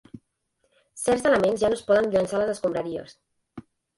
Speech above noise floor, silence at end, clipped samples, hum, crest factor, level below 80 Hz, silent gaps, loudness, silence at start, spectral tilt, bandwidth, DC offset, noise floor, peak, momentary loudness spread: 50 dB; 0.35 s; under 0.1%; none; 16 dB; -58 dBFS; none; -24 LUFS; 0.15 s; -4.5 dB/octave; 11.5 kHz; under 0.1%; -73 dBFS; -8 dBFS; 9 LU